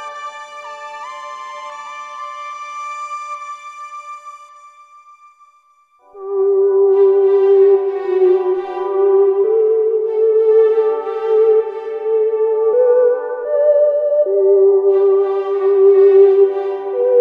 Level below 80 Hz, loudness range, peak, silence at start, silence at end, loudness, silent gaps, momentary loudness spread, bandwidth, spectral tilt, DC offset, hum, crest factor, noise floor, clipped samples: -76 dBFS; 16 LU; -2 dBFS; 0 s; 0 s; -14 LUFS; none; 19 LU; 7.4 kHz; -4.5 dB/octave; under 0.1%; none; 12 dB; -54 dBFS; under 0.1%